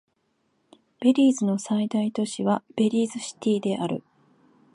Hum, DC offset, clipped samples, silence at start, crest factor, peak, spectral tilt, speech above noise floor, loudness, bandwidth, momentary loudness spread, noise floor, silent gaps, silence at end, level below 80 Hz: none; under 0.1%; under 0.1%; 1 s; 18 dB; -8 dBFS; -6 dB/octave; 48 dB; -25 LUFS; 11.5 kHz; 9 LU; -71 dBFS; none; 0.75 s; -74 dBFS